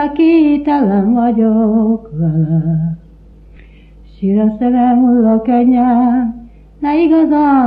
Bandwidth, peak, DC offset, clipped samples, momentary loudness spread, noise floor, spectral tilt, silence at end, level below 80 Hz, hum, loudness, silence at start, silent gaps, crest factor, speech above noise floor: 4.9 kHz; -2 dBFS; under 0.1%; under 0.1%; 8 LU; -39 dBFS; -11.5 dB/octave; 0 s; -40 dBFS; none; -12 LUFS; 0 s; none; 10 dB; 28 dB